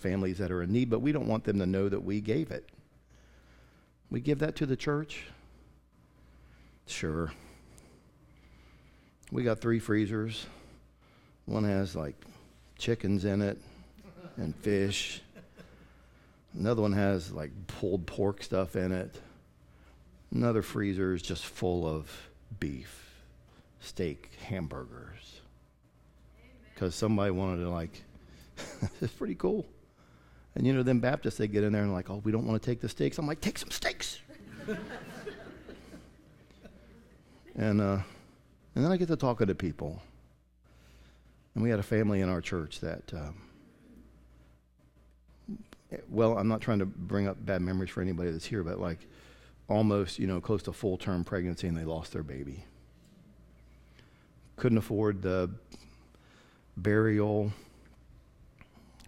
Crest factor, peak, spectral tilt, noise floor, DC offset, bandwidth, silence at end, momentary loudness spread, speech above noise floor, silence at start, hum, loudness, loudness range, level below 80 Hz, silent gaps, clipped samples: 22 dB; -12 dBFS; -6.5 dB/octave; -63 dBFS; under 0.1%; 16 kHz; 0 s; 19 LU; 32 dB; 0 s; none; -32 LUFS; 9 LU; -54 dBFS; none; under 0.1%